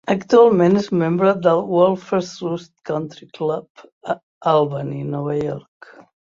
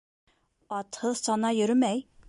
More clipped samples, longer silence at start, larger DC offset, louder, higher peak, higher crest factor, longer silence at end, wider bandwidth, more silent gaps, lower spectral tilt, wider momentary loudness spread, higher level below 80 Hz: neither; second, 0.05 s vs 0.7 s; neither; first, -19 LUFS vs -28 LUFS; first, -2 dBFS vs -14 dBFS; about the same, 18 dB vs 14 dB; first, 0.8 s vs 0.25 s; second, 7.4 kHz vs 11.5 kHz; first, 3.70-3.75 s, 3.92-4.01 s, 4.23-4.41 s vs none; first, -7.5 dB/octave vs -4 dB/octave; first, 15 LU vs 12 LU; first, -60 dBFS vs -70 dBFS